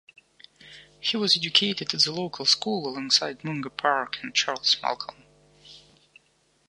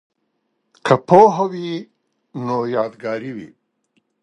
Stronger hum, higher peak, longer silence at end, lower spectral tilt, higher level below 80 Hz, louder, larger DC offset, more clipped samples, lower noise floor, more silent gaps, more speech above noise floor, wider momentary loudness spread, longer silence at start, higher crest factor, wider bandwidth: neither; second, -4 dBFS vs 0 dBFS; first, 0.9 s vs 0.75 s; second, -2 dB/octave vs -7 dB/octave; second, -70 dBFS vs -64 dBFS; second, -24 LUFS vs -17 LUFS; neither; neither; second, -66 dBFS vs -71 dBFS; neither; second, 40 dB vs 54 dB; second, 10 LU vs 20 LU; second, 0.65 s vs 0.85 s; about the same, 24 dB vs 20 dB; first, 11.5 kHz vs 10 kHz